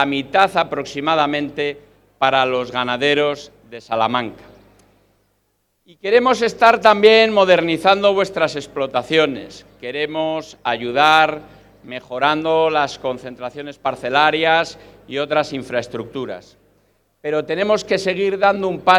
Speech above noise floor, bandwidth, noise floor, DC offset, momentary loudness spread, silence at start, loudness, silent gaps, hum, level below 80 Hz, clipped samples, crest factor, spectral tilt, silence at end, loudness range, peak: 49 dB; 13 kHz; -67 dBFS; under 0.1%; 17 LU; 0 s; -17 LUFS; none; 50 Hz at -50 dBFS; -56 dBFS; under 0.1%; 18 dB; -4.5 dB/octave; 0 s; 8 LU; 0 dBFS